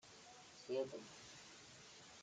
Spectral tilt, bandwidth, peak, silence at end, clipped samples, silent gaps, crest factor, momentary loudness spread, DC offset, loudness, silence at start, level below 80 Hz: -3.5 dB/octave; 9.6 kHz; -30 dBFS; 0 s; under 0.1%; none; 22 dB; 15 LU; under 0.1%; -51 LUFS; 0.05 s; -84 dBFS